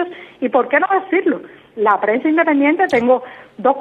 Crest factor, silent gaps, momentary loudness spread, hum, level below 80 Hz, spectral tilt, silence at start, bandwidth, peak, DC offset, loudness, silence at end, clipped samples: 16 dB; none; 11 LU; none; -62 dBFS; -6.5 dB/octave; 0 s; 7.6 kHz; 0 dBFS; under 0.1%; -16 LUFS; 0 s; under 0.1%